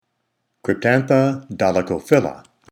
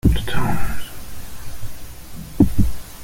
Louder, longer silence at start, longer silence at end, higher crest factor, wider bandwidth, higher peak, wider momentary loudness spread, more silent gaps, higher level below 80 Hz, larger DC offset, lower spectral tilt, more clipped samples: first, -19 LUFS vs -22 LUFS; first, 0.65 s vs 0.05 s; first, 0.3 s vs 0 s; about the same, 20 dB vs 16 dB; first, over 20 kHz vs 17 kHz; about the same, 0 dBFS vs -2 dBFS; second, 9 LU vs 19 LU; neither; second, -58 dBFS vs -28 dBFS; neither; about the same, -7 dB/octave vs -6.5 dB/octave; neither